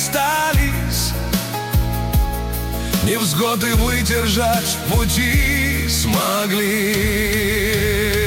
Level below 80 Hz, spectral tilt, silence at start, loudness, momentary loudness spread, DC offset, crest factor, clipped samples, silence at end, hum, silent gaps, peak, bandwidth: -24 dBFS; -4 dB/octave; 0 s; -18 LUFS; 5 LU; under 0.1%; 12 dB; under 0.1%; 0 s; none; none; -6 dBFS; 17 kHz